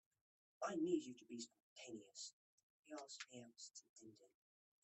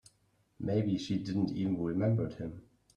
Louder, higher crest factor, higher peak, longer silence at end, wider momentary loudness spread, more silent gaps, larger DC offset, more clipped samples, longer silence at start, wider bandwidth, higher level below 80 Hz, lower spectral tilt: second, -50 LUFS vs -33 LUFS; first, 22 dB vs 14 dB; second, -30 dBFS vs -20 dBFS; first, 0.6 s vs 0.35 s; first, 18 LU vs 12 LU; first, 1.63-1.76 s, 2.33-2.83 s, 3.89-3.96 s vs none; neither; neither; about the same, 0.6 s vs 0.6 s; second, 8.4 kHz vs 10 kHz; second, under -90 dBFS vs -62 dBFS; second, -3.5 dB/octave vs -8 dB/octave